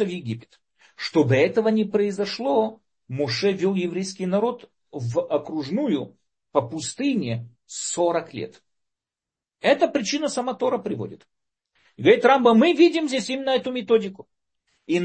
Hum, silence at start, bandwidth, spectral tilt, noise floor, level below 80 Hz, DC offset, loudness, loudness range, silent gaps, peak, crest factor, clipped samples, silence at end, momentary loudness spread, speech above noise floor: none; 0 s; 8.8 kHz; -5 dB/octave; -89 dBFS; -68 dBFS; under 0.1%; -22 LUFS; 7 LU; none; -4 dBFS; 20 dB; under 0.1%; 0 s; 16 LU; 67 dB